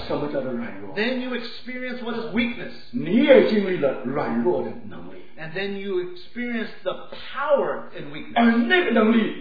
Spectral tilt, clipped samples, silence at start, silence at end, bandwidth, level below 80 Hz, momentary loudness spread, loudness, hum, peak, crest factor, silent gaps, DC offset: -8 dB/octave; under 0.1%; 0 s; 0 s; 5 kHz; -58 dBFS; 17 LU; -23 LUFS; none; -2 dBFS; 22 dB; none; 2%